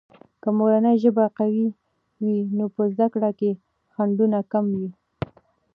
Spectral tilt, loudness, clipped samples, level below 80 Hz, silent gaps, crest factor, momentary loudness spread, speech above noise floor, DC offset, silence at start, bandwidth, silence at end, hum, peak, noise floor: -11 dB/octave; -22 LUFS; under 0.1%; -62 dBFS; none; 16 dB; 16 LU; 34 dB; under 0.1%; 0.45 s; 4.8 kHz; 0.85 s; none; -6 dBFS; -55 dBFS